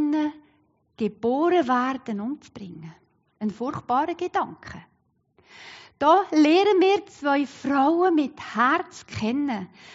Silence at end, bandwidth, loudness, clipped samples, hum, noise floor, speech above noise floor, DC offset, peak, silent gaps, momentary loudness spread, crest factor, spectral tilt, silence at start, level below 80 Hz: 0 s; 7.6 kHz; -23 LUFS; under 0.1%; none; -65 dBFS; 42 dB; under 0.1%; -8 dBFS; none; 22 LU; 16 dB; -3.5 dB/octave; 0 s; -66 dBFS